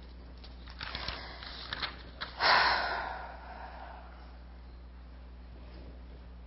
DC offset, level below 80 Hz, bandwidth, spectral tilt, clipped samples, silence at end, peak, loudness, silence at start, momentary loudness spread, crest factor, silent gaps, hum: under 0.1%; -48 dBFS; 5.8 kHz; -6 dB/octave; under 0.1%; 0 s; -12 dBFS; -32 LUFS; 0 s; 25 LU; 24 dB; none; 60 Hz at -50 dBFS